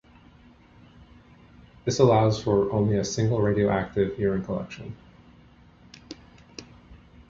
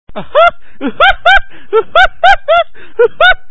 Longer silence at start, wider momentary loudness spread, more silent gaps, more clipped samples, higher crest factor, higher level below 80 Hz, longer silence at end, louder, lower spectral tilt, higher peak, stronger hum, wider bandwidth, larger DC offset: first, 1.85 s vs 0.05 s; first, 24 LU vs 7 LU; neither; second, under 0.1% vs 1%; first, 20 dB vs 10 dB; second, -50 dBFS vs -30 dBFS; first, 0.35 s vs 0.15 s; second, -24 LUFS vs -9 LUFS; first, -6.5 dB/octave vs -3.5 dB/octave; second, -6 dBFS vs 0 dBFS; neither; about the same, 7.6 kHz vs 8 kHz; second, under 0.1% vs 8%